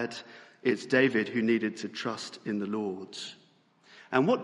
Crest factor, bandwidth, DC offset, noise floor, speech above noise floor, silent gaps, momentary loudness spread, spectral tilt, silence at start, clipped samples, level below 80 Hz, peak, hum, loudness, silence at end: 20 dB; 11.5 kHz; under 0.1%; -63 dBFS; 34 dB; none; 15 LU; -5.5 dB/octave; 0 s; under 0.1%; -78 dBFS; -10 dBFS; none; -30 LUFS; 0 s